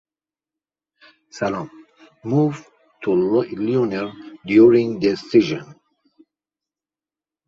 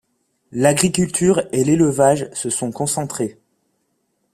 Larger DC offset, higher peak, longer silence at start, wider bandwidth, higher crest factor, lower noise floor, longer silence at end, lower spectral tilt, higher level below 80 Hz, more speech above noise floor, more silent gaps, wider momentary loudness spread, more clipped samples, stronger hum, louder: neither; about the same, -2 dBFS vs 0 dBFS; first, 1.35 s vs 0.55 s; second, 7.4 kHz vs 15 kHz; about the same, 18 dB vs 18 dB; first, under -90 dBFS vs -69 dBFS; first, 1.75 s vs 1.05 s; first, -7.5 dB/octave vs -5 dB/octave; second, -60 dBFS vs -52 dBFS; first, over 72 dB vs 51 dB; neither; first, 17 LU vs 10 LU; neither; neither; about the same, -19 LUFS vs -18 LUFS